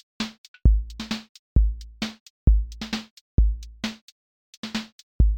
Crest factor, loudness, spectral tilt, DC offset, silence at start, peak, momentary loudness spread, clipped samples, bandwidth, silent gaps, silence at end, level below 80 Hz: 20 dB; -27 LUFS; -6 dB/octave; under 0.1%; 0.2 s; -6 dBFS; 11 LU; under 0.1%; 8.4 kHz; 0.38-0.54 s, 1.29-1.56 s, 2.20-2.47 s, 3.11-3.38 s, 4.02-4.63 s, 4.92-5.19 s; 0 s; -24 dBFS